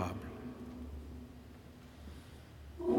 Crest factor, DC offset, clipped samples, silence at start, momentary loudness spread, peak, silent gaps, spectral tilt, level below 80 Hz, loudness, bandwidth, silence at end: 22 dB; under 0.1%; under 0.1%; 0 s; 12 LU; -20 dBFS; none; -7.5 dB/octave; -54 dBFS; -48 LUFS; 17 kHz; 0 s